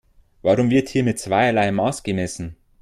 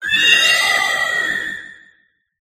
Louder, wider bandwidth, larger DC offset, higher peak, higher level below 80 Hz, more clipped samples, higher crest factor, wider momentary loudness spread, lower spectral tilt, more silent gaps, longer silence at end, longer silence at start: second, -20 LUFS vs -13 LUFS; second, 14 kHz vs 15.5 kHz; neither; second, -6 dBFS vs 0 dBFS; first, -50 dBFS vs -58 dBFS; neither; about the same, 16 dB vs 18 dB; second, 10 LU vs 14 LU; first, -6 dB/octave vs 1 dB/octave; neither; second, 0.3 s vs 0.7 s; first, 0.45 s vs 0 s